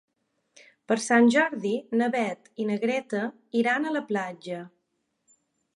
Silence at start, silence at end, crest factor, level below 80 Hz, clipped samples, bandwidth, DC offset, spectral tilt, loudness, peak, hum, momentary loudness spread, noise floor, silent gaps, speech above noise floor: 0.9 s; 1.1 s; 18 dB; -80 dBFS; under 0.1%; 11.5 kHz; under 0.1%; -4.5 dB/octave; -26 LUFS; -8 dBFS; none; 13 LU; -77 dBFS; none; 51 dB